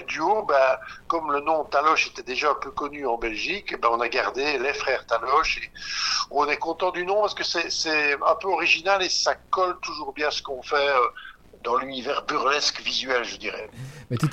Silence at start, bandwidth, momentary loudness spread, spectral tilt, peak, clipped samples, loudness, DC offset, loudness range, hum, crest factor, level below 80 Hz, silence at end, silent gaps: 0 s; 15 kHz; 9 LU; -3 dB/octave; -6 dBFS; under 0.1%; -24 LUFS; under 0.1%; 3 LU; none; 18 dB; -52 dBFS; 0 s; none